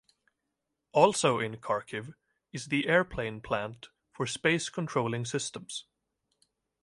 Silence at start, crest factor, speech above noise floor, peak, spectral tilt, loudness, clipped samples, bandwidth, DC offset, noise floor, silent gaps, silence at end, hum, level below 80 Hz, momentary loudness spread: 0.95 s; 24 dB; 54 dB; -8 dBFS; -4 dB/octave; -30 LUFS; under 0.1%; 11.5 kHz; under 0.1%; -84 dBFS; none; 1 s; none; -62 dBFS; 16 LU